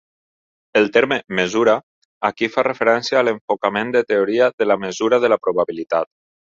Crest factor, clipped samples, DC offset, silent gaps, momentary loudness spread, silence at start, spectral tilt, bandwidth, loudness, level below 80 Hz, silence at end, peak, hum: 18 dB; under 0.1%; under 0.1%; 1.83-2.21 s, 3.41-3.48 s, 4.53-4.58 s; 6 LU; 0.75 s; -4.5 dB/octave; 7.6 kHz; -18 LUFS; -62 dBFS; 0.45 s; -2 dBFS; none